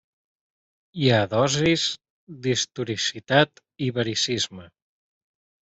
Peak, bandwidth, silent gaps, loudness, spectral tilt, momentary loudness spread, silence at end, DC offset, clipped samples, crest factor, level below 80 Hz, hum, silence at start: -4 dBFS; 8.4 kHz; 2.10-2.27 s; -23 LUFS; -4 dB/octave; 9 LU; 1 s; under 0.1%; under 0.1%; 22 dB; -60 dBFS; none; 0.95 s